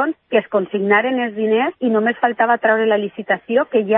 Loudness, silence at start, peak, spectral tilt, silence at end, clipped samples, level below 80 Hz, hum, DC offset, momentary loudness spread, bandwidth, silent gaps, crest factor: -17 LUFS; 0 s; -2 dBFS; -10.5 dB/octave; 0 s; under 0.1%; -70 dBFS; none; under 0.1%; 5 LU; 3.9 kHz; none; 16 dB